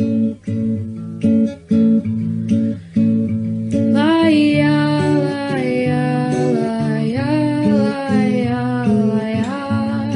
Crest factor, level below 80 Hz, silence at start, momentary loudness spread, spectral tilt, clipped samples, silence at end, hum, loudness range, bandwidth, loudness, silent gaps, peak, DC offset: 14 dB; -54 dBFS; 0 s; 7 LU; -7.5 dB/octave; under 0.1%; 0 s; none; 2 LU; 10.5 kHz; -17 LUFS; none; -2 dBFS; under 0.1%